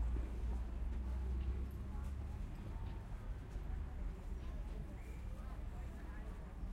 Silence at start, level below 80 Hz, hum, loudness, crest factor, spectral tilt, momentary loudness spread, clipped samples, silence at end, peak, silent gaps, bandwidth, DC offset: 0 s; -44 dBFS; none; -47 LUFS; 12 dB; -7.5 dB/octave; 7 LU; under 0.1%; 0 s; -32 dBFS; none; 9.8 kHz; under 0.1%